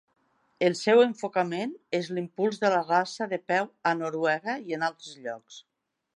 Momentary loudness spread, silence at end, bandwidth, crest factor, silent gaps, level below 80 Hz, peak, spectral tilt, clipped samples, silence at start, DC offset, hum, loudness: 12 LU; 0.55 s; 11 kHz; 20 dB; none; -82 dBFS; -8 dBFS; -5 dB/octave; under 0.1%; 0.6 s; under 0.1%; none; -27 LUFS